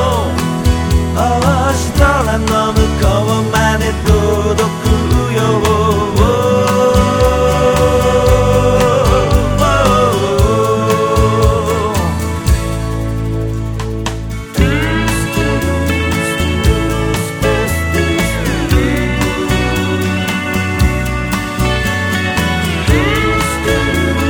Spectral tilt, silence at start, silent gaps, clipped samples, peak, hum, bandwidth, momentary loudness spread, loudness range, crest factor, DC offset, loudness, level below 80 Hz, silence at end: -5.5 dB/octave; 0 s; none; under 0.1%; 0 dBFS; none; 20 kHz; 5 LU; 4 LU; 12 dB; under 0.1%; -13 LUFS; -20 dBFS; 0 s